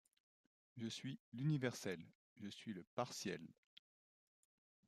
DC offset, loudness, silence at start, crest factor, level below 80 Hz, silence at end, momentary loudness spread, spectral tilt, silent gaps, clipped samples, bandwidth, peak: under 0.1%; -47 LUFS; 0.75 s; 22 dB; -88 dBFS; 1.35 s; 15 LU; -5.5 dB/octave; 1.20-1.32 s, 2.15-2.36 s, 2.87-2.97 s; under 0.1%; 14.5 kHz; -28 dBFS